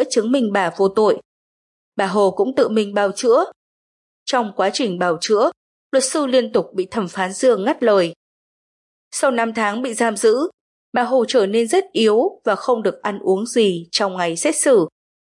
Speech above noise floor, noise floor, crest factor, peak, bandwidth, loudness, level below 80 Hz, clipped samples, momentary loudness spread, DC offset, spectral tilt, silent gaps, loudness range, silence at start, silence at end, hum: over 73 dB; under -90 dBFS; 14 dB; -4 dBFS; 11.5 kHz; -18 LUFS; -70 dBFS; under 0.1%; 7 LU; under 0.1%; -3.5 dB/octave; 1.25-1.92 s, 3.56-4.26 s, 5.57-5.90 s, 8.16-9.11 s, 10.54-10.92 s; 2 LU; 0 s; 0.4 s; none